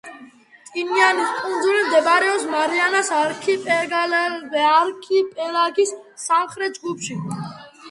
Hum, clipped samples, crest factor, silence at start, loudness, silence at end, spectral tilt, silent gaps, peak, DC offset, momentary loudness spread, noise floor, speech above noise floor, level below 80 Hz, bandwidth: none; under 0.1%; 20 dB; 0.05 s; -19 LUFS; 0 s; -3 dB/octave; none; 0 dBFS; under 0.1%; 12 LU; -47 dBFS; 27 dB; -70 dBFS; 11.5 kHz